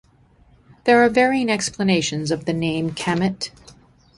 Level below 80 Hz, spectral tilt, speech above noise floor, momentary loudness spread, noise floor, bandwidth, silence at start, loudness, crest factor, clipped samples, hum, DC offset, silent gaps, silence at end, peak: -52 dBFS; -4.5 dB/octave; 35 dB; 9 LU; -54 dBFS; 11.5 kHz; 0.85 s; -20 LUFS; 18 dB; under 0.1%; none; under 0.1%; none; 0.7 s; -2 dBFS